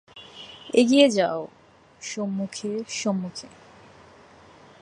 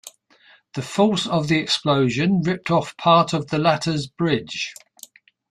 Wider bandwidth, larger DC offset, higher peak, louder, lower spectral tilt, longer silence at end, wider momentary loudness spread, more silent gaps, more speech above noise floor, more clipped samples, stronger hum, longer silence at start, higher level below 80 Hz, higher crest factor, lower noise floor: second, 11 kHz vs 14.5 kHz; neither; about the same, -2 dBFS vs -4 dBFS; second, -23 LUFS vs -20 LUFS; about the same, -4.5 dB/octave vs -5.5 dB/octave; first, 1.35 s vs 0.8 s; first, 24 LU vs 11 LU; neither; second, 28 dB vs 34 dB; neither; neither; about the same, 0.15 s vs 0.05 s; second, -68 dBFS vs -58 dBFS; first, 24 dB vs 18 dB; second, -51 dBFS vs -55 dBFS